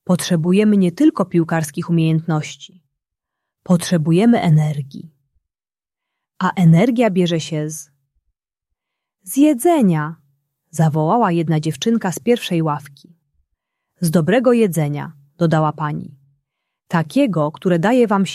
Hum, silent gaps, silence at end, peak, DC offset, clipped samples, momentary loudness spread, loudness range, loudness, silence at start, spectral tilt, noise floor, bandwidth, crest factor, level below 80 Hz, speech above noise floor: none; none; 0 s; -2 dBFS; under 0.1%; under 0.1%; 11 LU; 2 LU; -17 LUFS; 0.1 s; -6.5 dB/octave; under -90 dBFS; 14 kHz; 16 dB; -60 dBFS; over 74 dB